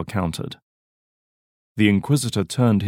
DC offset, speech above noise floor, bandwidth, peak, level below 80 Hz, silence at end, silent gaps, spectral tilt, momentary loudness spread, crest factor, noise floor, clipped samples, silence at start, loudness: under 0.1%; over 70 dB; 16.5 kHz; -4 dBFS; -52 dBFS; 0 s; 0.63-1.76 s; -6 dB/octave; 15 LU; 18 dB; under -90 dBFS; under 0.1%; 0 s; -21 LUFS